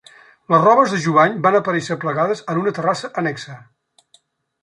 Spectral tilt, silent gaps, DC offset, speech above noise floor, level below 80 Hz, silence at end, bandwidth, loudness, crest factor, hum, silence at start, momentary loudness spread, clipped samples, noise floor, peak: -6 dB/octave; none; under 0.1%; 41 dB; -66 dBFS; 1.05 s; 11 kHz; -17 LUFS; 16 dB; none; 0.5 s; 10 LU; under 0.1%; -58 dBFS; -2 dBFS